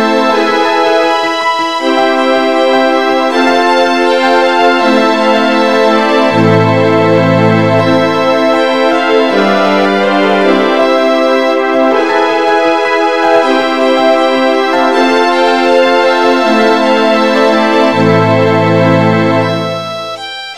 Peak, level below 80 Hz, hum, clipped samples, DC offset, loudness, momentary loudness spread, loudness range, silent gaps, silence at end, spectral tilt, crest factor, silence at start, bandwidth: 0 dBFS; -52 dBFS; none; 0.2%; 2%; -9 LUFS; 2 LU; 1 LU; none; 0 s; -5.5 dB/octave; 10 dB; 0 s; 14.5 kHz